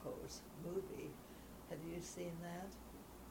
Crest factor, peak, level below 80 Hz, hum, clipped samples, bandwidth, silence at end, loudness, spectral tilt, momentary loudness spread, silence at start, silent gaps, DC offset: 18 dB; -32 dBFS; -64 dBFS; none; under 0.1%; 19.5 kHz; 0 s; -50 LUFS; -5 dB/octave; 10 LU; 0 s; none; under 0.1%